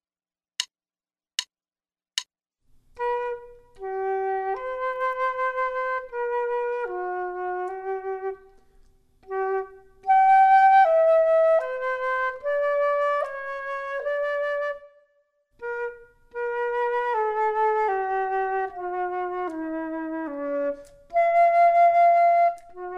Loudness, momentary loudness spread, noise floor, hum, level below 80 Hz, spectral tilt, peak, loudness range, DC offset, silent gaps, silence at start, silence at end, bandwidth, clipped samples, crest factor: -24 LUFS; 15 LU; under -90 dBFS; none; -60 dBFS; -2 dB/octave; -8 dBFS; 11 LU; under 0.1%; none; 0.6 s; 0 s; 10.5 kHz; under 0.1%; 18 dB